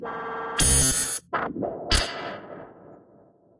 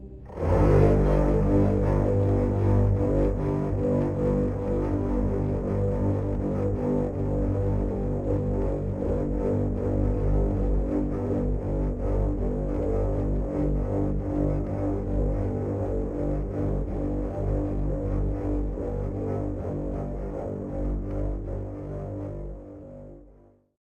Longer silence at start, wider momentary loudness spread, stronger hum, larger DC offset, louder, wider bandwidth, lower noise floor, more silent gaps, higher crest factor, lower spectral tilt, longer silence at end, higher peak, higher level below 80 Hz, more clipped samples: about the same, 0 s vs 0 s; first, 20 LU vs 10 LU; second, none vs 50 Hz at -40 dBFS; neither; first, -23 LUFS vs -27 LUFS; first, 11.5 kHz vs 6.8 kHz; about the same, -56 dBFS vs -55 dBFS; neither; about the same, 20 dB vs 18 dB; second, -2 dB/octave vs -10.5 dB/octave; about the same, 0.6 s vs 0.55 s; about the same, -6 dBFS vs -8 dBFS; second, -36 dBFS vs -30 dBFS; neither